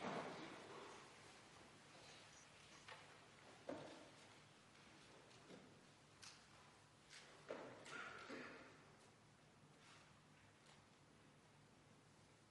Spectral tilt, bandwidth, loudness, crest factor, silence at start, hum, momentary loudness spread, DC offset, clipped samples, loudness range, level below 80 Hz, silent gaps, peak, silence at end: -3.5 dB/octave; 11.5 kHz; -60 LUFS; 24 dB; 0 s; none; 14 LU; under 0.1%; under 0.1%; 9 LU; -88 dBFS; none; -38 dBFS; 0 s